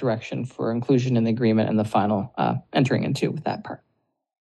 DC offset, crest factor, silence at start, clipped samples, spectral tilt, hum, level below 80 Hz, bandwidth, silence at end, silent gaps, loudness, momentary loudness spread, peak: under 0.1%; 16 dB; 0 s; under 0.1%; -7.5 dB/octave; none; -64 dBFS; 12 kHz; 0.7 s; none; -23 LUFS; 10 LU; -8 dBFS